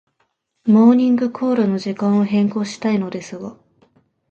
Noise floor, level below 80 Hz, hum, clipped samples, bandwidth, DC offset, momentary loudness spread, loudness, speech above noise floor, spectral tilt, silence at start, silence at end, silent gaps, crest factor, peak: -68 dBFS; -66 dBFS; none; under 0.1%; 8.4 kHz; under 0.1%; 17 LU; -17 LUFS; 51 dB; -7.5 dB/octave; 0.65 s; 0.8 s; none; 16 dB; -2 dBFS